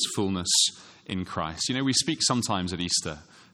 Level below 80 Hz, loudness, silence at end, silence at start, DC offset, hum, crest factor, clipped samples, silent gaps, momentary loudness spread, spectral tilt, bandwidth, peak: -56 dBFS; -25 LUFS; 0.3 s; 0 s; under 0.1%; none; 18 dB; under 0.1%; none; 14 LU; -2.5 dB/octave; 16 kHz; -10 dBFS